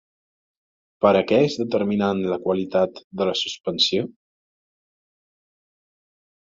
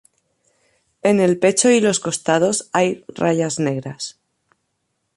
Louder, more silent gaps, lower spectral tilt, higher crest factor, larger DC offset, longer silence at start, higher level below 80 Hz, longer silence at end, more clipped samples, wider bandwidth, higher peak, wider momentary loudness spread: second, -21 LUFS vs -18 LUFS; first, 3.04-3.11 s vs none; about the same, -5 dB/octave vs -4 dB/octave; about the same, 20 dB vs 18 dB; neither; about the same, 1 s vs 1.05 s; about the same, -60 dBFS vs -62 dBFS; first, 2.35 s vs 1.05 s; neither; second, 7.6 kHz vs 11.5 kHz; about the same, -4 dBFS vs -2 dBFS; second, 8 LU vs 11 LU